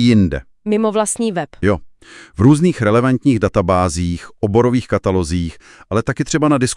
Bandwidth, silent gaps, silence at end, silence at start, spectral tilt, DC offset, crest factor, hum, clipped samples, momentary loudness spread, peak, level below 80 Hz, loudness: 12 kHz; none; 0 s; 0 s; -6 dB/octave; under 0.1%; 16 dB; none; under 0.1%; 9 LU; 0 dBFS; -40 dBFS; -16 LUFS